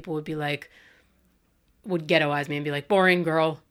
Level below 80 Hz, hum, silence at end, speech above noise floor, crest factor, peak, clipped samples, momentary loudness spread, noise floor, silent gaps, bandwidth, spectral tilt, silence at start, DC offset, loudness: -64 dBFS; none; 0.15 s; 41 dB; 20 dB; -6 dBFS; under 0.1%; 11 LU; -66 dBFS; none; 15.5 kHz; -6 dB/octave; 0 s; under 0.1%; -24 LUFS